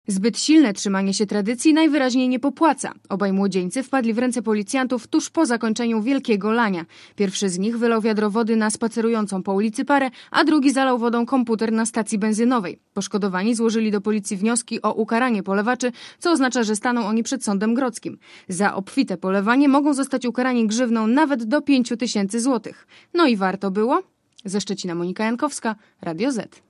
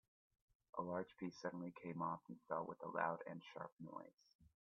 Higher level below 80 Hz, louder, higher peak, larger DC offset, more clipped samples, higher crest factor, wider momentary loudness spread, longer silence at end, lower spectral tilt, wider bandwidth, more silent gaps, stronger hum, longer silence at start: first, -72 dBFS vs -86 dBFS; first, -21 LUFS vs -48 LUFS; first, -4 dBFS vs -24 dBFS; neither; neither; second, 16 dB vs 24 dB; second, 8 LU vs 11 LU; about the same, 0.25 s vs 0.15 s; about the same, -4.5 dB/octave vs -5.5 dB/octave; first, 12 kHz vs 6.8 kHz; second, none vs 3.72-3.77 s, 4.35-4.39 s; neither; second, 0.1 s vs 0.75 s